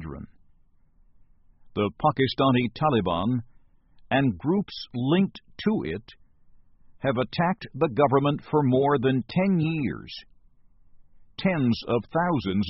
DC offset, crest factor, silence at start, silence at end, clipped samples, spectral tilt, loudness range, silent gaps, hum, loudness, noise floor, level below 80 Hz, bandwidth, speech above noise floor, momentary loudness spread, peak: under 0.1%; 18 dB; 0 s; 0 s; under 0.1%; -5.5 dB/octave; 4 LU; none; none; -25 LUFS; -58 dBFS; -54 dBFS; 6 kHz; 34 dB; 12 LU; -8 dBFS